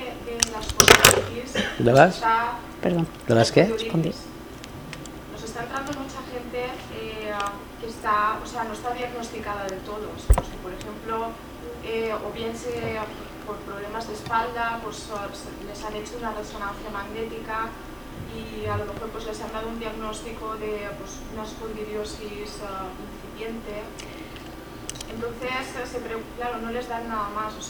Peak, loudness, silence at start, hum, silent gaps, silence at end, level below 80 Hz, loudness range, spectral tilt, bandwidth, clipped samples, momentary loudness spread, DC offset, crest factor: 0 dBFS; -26 LUFS; 0 s; none; none; 0 s; -38 dBFS; 12 LU; -3.5 dB/octave; over 20 kHz; under 0.1%; 17 LU; under 0.1%; 26 dB